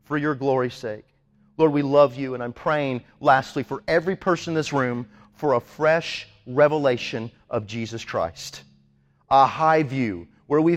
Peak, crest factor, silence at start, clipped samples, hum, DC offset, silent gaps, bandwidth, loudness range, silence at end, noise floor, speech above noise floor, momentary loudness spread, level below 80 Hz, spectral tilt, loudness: -4 dBFS; 20 dB; 0.1 s; under 0.1%; none; under 0.1%; none; 14 kHz; 2 LU; 0 s; -61 dBFS; 39 dB; 15 LU; -58 dBFS; -6 dB/octave; -23 LUFS